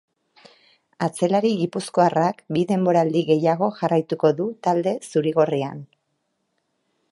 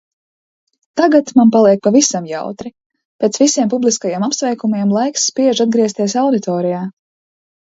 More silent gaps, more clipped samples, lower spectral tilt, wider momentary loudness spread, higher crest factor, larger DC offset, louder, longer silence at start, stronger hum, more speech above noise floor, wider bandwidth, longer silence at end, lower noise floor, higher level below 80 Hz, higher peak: second, none vs 2.86-2.90 s, 3.05-3.19 s; neither; first, -6.5 dB/octave vs -4 dB/octave; second, 6 LU vs 13 LU; about the same, 18 dB vs 16 dB; neither; second, -21 LUFS vs -14 LUFS; about the same, 1 s vs 0.95 s; neither; second, 53 dB vs over 76 dB; first, 11.5 kHz vs 8 kHz; first, 1.25 s vs 0.85 s; second, -73 dBFS vs under -90 dBFS; second, -70 dBFS vs -62 dBFS; second, -4 dBFS vs 0 dBFS